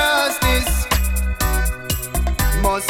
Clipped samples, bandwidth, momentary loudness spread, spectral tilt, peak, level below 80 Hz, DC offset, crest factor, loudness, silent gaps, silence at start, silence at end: under 0.1%; 18.5 kHz; 5 LU; -3.5 dB/octave; -4 dBFS; -22 dBFS; under 0.1%; 14 dB; -19 LUFS; none; 0 s; 0 s